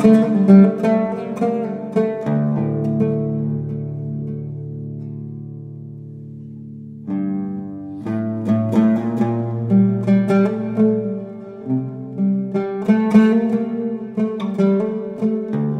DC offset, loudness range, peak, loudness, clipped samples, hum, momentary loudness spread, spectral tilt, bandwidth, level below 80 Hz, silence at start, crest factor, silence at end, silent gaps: under 0.1%; 11 LU; 0 dBFS; -19 LUFS; under 0.1%; none; 19 LU; -9.5 dB/octave; 6.2 kHz; -58 dBFS; 0 s; 18 dB; 0 s; none